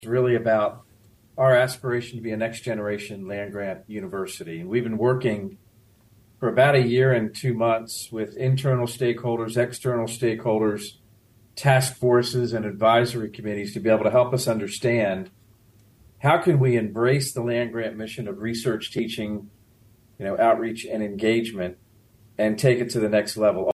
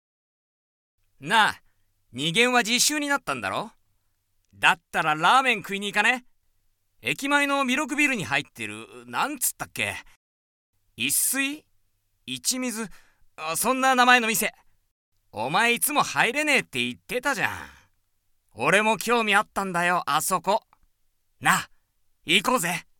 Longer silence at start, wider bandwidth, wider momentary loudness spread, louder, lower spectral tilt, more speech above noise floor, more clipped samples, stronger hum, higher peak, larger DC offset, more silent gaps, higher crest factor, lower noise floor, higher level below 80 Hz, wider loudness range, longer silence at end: second, 0 s vs 1.2 s; second, 12.5 kHz vs 18 kHz; about the same, 13 LU vs 15 LU; about the same, -23 LUFS vs -23 LUFS; first, -6 dB/octave vs -2 dB/octave; second, 34 dB vs 46 dB; neither; neither; second, -6 dBFS vs -2 dBFS; neither; second, none vs 10.16-10.73 s, 14.91-15.12 s; second, 18 dB vs 24 dB; second, -56 dBFS vs -70 dBFS; about the same, -60 dBFS vs -62 dBFS; about the same, 6 LU vs 5 LU; second, 0 s vs 0.2 s